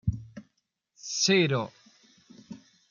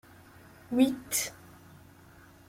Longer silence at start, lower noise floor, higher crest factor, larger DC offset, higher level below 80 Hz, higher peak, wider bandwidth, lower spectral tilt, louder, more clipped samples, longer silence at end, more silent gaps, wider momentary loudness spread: second, 0.05 s vs 0.7 s; first, -77 dBFS vs -55 dBFS; about the same, 20 dB vs 22 dB; neither; first, -52 dBFS vs -66 dBFS; about the same, -12 dBFS vs -12 dBFS; second, 7.4 kHz vs 16.5 kHz; about the same, -4 dB/octave vs -3 dB/octave; first, -26 LUFS vs -29 LUFS; neither; second, 0.35 s vs 1.15 s; neither; first, 26 LU vs 13 LU